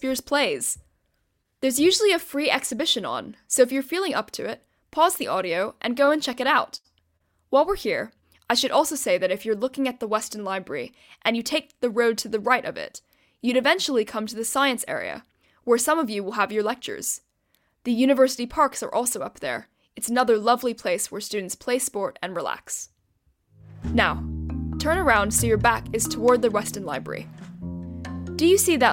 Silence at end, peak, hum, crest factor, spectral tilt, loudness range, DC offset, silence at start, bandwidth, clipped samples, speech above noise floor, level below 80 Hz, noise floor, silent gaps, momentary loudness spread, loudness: 0 s; -6 dBFS; none; 20 dB; -3 dB/octave; 3 LU; under 0.1%; 0 s; 17 kHz; under 0.1%; 49 dB; -48 dBFS; -72 dBFS; none; 14 LU; -23 LUFS